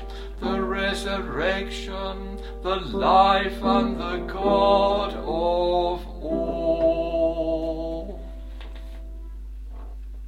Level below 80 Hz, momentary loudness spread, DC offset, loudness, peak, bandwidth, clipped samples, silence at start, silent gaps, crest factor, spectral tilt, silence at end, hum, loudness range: -36 dBFS; 21 LU; under 0.1%; -24 LUFS; -6 dBFS; 13 kHz; under 0.1%; 0 s; none; 18 dB; -6 dB/octave; 0 s; none; 6 LU